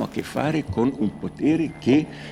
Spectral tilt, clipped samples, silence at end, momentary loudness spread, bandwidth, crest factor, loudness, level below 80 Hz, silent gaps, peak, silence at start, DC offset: -7 dB/octave; under 0.1%; 0 s; 7 LU; 14.5 kHz; 16 dB; -23 LUFS; -52 dBFS; none; -6 dBFS; 0 s; under 0.1%